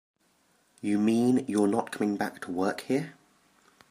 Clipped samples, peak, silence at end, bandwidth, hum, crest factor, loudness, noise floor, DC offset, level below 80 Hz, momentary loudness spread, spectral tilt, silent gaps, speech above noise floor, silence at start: under 0.1%; -12 dBFS; 0.8 s; 15.5 kHz; none; 18 dB; -28 LUFS; -68 dBFS; under 0.1%; -74 dBFS; 8 LU; -6 dB/octave; none; 41 dB; 0.85 s